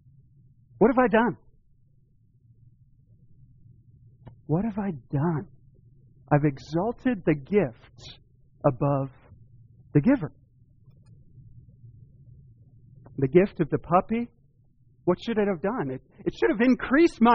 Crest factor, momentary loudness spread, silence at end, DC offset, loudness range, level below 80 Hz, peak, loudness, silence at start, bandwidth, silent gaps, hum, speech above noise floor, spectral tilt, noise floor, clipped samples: 22 dB; 14 LU; 0 s; under 0.1%; 6 LU; -52 dBFS; -6 dBFS; -25 LUFS; 0.8 s; 6 kHz; none; none; 37 dB; -7 dB/octave; -61 dBFS; under 0.1%